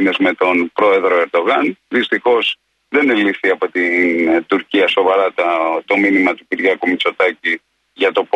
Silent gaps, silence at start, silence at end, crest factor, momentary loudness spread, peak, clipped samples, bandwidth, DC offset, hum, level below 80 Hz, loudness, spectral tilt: none; 0 s; 0.1 s; 14 dB; 5 LU; -2 dBFS; under 0.1%; 9.2 kHz; under 0.1%; none; -64 dBFS; -15 LUFS; -5.5 dB/octave